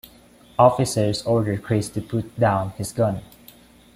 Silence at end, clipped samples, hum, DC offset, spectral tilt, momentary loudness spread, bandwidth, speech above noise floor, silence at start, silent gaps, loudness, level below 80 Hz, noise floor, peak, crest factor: 0.7 s; under 0.1%; none; under 0.1%; -6 dB/octave; 11 LU; 16 kHz; 29 dB; 0.6 s; none; -22 LUFS; -50 dBFS; -50 dBFS; -2 dBFS; 20 dB